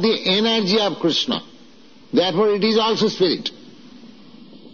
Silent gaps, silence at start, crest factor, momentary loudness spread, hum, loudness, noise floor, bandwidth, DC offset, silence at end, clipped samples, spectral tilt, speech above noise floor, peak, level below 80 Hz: none; 0 s; 16 dB; 7 LU; none; -19 LUFS; -48 dBFS; 7 kHz; 0.4%; 0.05 s; under 0.1%; -3 dB/octave; 29 dB; -6 dBFS; -64 dBFS